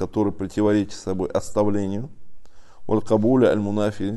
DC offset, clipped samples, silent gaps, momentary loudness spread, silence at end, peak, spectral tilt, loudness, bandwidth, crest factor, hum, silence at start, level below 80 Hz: under 0.1%; under 0.1%; none; 10 LU; 0 s; -6 dBFS; -7 dB/octave; -22 LUFS; 12 kHz; 16 dB; none; 0 s; -48 dBFS